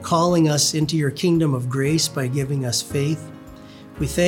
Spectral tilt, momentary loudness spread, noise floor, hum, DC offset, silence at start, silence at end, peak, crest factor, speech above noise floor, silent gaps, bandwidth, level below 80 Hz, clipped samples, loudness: -5 dB/octave; 12 LU; -41 dBFS; none; under 0.1%; 0 s; 0 s; -6 dBFS; 16 dB; 21 dB; none; 18.5 kHz; -46 dBFS; under 0.1%; -20 LUFS